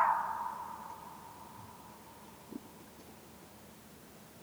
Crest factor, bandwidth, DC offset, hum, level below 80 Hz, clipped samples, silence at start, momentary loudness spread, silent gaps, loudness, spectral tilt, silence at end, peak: 24 dB; over 20 kHz; under 0.1%; none; -70 dBFS; under 0.1%; 0 s; 16 LU; none; -43 LUFS; -4 dB/octave; 0 s; -16 dBFS